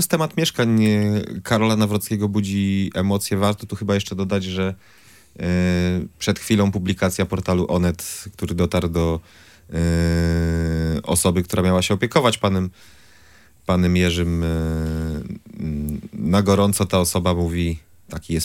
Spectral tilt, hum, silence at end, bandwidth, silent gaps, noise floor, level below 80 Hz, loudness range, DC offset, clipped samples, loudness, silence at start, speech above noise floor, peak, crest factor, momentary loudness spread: -5.5 dB/octave; none; 0 s; 17 kHz; none; -52 dBFS; -40 dBFS; 3 LU; under 0.1%; under 0.1%; -21 LUFS; 0 s; 32 dB; -2 dBFS; 18 dB; 10 LU